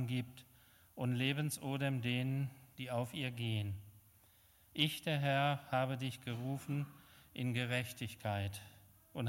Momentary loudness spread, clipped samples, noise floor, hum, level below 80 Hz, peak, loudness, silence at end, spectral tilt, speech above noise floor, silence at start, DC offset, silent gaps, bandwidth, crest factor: 14 LU; under 0.1%; -67 dBFS; none; -74 dBFS; -16 dBFS; -39 LUFS; 0 s; -5.5 dB/octave; 29 dB; 0 s; under 0.1%; none; 16.5 kHz; 22 dB